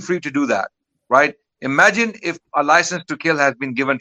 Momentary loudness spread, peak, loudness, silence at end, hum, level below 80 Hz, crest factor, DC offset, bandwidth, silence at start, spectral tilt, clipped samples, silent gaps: 9 LU; 0 dBFS; -17 LUFS; 0 s; none; -68 dBFS; 18 dB; under 0.1%; 11 kHz; 0 s; -4 dB/octave; under 0.1%; none